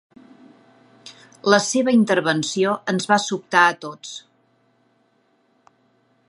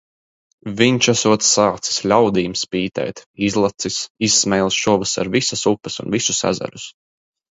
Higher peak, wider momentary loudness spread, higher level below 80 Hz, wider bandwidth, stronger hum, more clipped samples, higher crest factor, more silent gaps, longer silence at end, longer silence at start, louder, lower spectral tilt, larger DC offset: about the same, 0 dBFS vs 0 dBFS; first, 16 LU vs 11 LU; second, -72 dBFS vs -52 dBFS; first, 11.5 kHz vs 8 kHz; neither; neither; about the same, 22 dB vs 18 dB; second, none vs 3.26-3.34 s, 4.10-4.15 s; first, 2.1 s vs 0.65 s; first, 1.05 s vs 0.65 s; about the same, -19 LUFS vs -17 LUFS; about the same, -4 dB/octave vs -3 dB/octave; neither